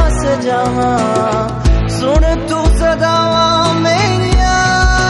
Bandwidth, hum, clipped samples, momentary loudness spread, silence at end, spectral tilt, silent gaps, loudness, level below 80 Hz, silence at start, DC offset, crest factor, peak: 11.5 kHz; none; under 0.1%; 4 LU; 0 s; -5 dB/octave; none; -13 LUFS; -18 dBFS; 0 s; under 0.1%; 12 dB; 0 dBFS